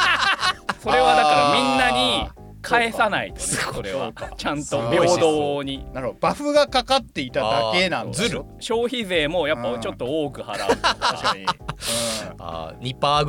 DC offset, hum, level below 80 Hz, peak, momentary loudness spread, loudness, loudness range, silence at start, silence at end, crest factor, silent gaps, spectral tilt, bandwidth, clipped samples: under 0.1%; none; -44 dBFS; -6 dBFS; 12 LU; -21 LUFS; 4 LU; 0 s; 0 s; 16 dB; none; -3.5 dB/octave; 18 kHz; under 0.1%